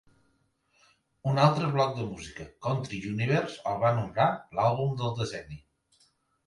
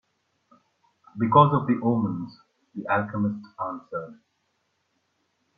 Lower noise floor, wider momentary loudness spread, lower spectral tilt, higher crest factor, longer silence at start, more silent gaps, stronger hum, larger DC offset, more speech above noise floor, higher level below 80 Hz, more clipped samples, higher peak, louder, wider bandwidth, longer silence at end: about the same, -71 dBFS vs -73 dBFS; second, 15 LU vs 22 LU; second, -6.5 dB/octave vs -10 dB/octave; about the same, 20 dB vs 24 dB; about the same, 1.25 s vs 1.15 s; neither; neither; neither; second, 43 dB vs 49 dB; first, -60 dBFS vs -66 dBFS; neither; second, -8 dBFS vs -2 dBFS; second, -28 LUFS vs -24 LUFS; first, 11.5 kHz vs 5 kHz; second, 0.9 s vs 1.45 s